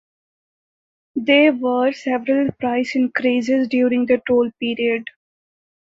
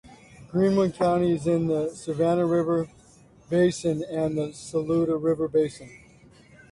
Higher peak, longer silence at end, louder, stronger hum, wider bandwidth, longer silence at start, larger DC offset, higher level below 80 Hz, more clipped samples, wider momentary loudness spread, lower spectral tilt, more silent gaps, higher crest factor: first, -2 dBFS vs -12 dBFS; first, 0.9 s vs 0.75 s; first, -18 LUFS vs -25 LUFS; neither; second, 7.6 kHz vs 11.5 kHz; first, 1.15 s vs 0.1 s; neither; about the same, -60 dBFS vs -56 dBFS; neither; about the same, 8 LU vs 8 LU; second, -5.5 dB/octave vs -7 dB/octave; neither; about the same, 18 dB vs 14 dB